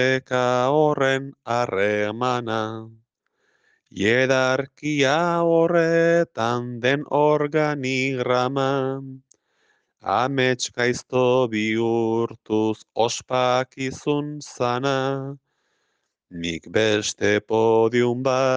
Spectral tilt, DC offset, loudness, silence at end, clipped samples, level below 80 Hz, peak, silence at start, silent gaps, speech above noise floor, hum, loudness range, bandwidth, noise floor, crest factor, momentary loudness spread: -5 dB/octave; under 0.1%; -22 LUFS; 0 s; under 0.1%; -66 dBFS; -6 dBFS; 0 s; none; 52 dB; none; 5 LU; 10 kHz; -74 dBFS; 16 dB; 8 LU